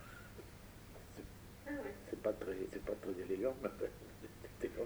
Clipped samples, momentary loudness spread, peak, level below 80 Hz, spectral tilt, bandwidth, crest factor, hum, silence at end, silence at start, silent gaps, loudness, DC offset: under 0.1%; 15 LU; -24 dBFS; -60 dBFS; -6 dB/octave; over 20 kHz; 20 dB; none; 0 s; 0 s; none; -45 LUFS; under 0.1%